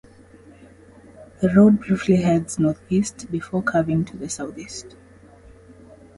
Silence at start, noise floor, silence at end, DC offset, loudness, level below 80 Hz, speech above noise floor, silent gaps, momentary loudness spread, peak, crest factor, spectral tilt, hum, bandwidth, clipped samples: 1.2 s; -48 dBFS; 1.3 s; under 0.1%; -21 LUFS; -50 dBFS; 28 dB; none; 16 LU; -4 dBFS; 18 dB; -6.5 dB/octave; none; 11.5 kHz; under 0.1%